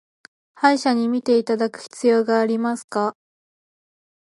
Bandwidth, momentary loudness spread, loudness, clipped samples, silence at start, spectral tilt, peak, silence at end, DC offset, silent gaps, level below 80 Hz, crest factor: 11.5 kHz; 7 LU; -20 LUFS; under 0.1%; 0.6 s; -4.5 dB/octave; -2 dBFS; 1.1 s; under 0.1%; 2.84-2.88 s; -76 dBFS; 20 dB